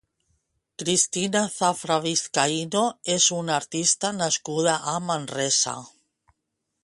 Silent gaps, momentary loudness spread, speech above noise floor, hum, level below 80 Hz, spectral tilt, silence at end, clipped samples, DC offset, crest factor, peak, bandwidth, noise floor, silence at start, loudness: none; 6 LU; 55 dB; none; -68 dBFS; -2.5 dB/octave; 0.95 s; under 0.1%; under 0.1%; 20 dB; -6 dBFS; 11.5 kHz; -80 dBFS; 0.8 s; -23 LUFS